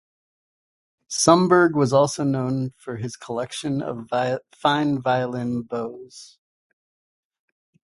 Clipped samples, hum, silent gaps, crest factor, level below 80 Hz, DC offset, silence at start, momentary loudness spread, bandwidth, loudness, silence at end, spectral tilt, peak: under 0.1%; none; none; 24 dB; -62 dBFS; under 0.1%; 1.1 s; 14 LU; 11.5 kHz; -22 LUFS; 1.7 s; -5 dB/octave; 0 dBFS